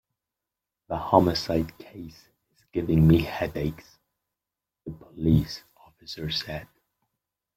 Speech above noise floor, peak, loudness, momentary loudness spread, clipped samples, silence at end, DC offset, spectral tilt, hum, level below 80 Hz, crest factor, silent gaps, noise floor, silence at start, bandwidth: 63 dB; -2 dBFS; -25 LUFS; 22 LU; under 0.1%; 0.9 s; under 0.1%; -7 dB/octave; none; -46 dBFS; 24 dB; none; -88 dBFS; 0.9 s; 15.5 kHz